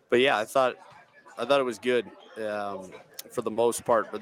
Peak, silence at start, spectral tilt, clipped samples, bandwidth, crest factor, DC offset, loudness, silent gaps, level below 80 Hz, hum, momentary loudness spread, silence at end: -10 dBFS; 0.1 s; -3.5 dB/octave; under 0.1%; 18.5 kHz; 18 dB; under 0.1%; -27 LUFS; none; -74 dBFS; none; 19 LU; 0 s